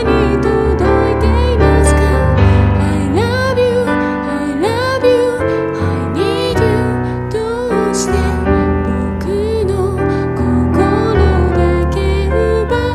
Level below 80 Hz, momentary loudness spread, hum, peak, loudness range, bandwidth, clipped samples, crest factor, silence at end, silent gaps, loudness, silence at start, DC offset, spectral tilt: -20 dBFS; 6 LU; none; 0 dBFS; 3 LU; 13 kHz; under 0.1%; 12 dB; 0 s; none; -14 LUFS; 0 s; under 0.1%; -6.5 dB/octave